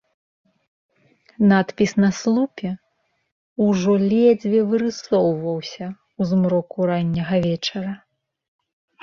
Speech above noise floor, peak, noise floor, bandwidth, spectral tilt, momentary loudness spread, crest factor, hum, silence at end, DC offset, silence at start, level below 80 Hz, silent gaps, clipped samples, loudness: 50 dB; -4 dBFS; -69 dBFS; 7.4 kHz; -7 dB/octave; 14 LU; 16 dB; none; 1.05 s; under 0.1%; 1.4 s; -58 dBFS; 3.32-3.56 s; under 0.1%; -20 LUFS